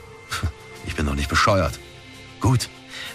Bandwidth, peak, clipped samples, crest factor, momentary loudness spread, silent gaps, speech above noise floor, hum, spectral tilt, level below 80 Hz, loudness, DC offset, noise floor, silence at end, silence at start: 15 kHz; -8 dBFS; under 0.1%; 16 dB; 20 LU; none; 22 dB; none; -5 dB/octave; -34 dBFS; -23 LUFS; under 0.1%; -42 dBFS; 0 s; 0 s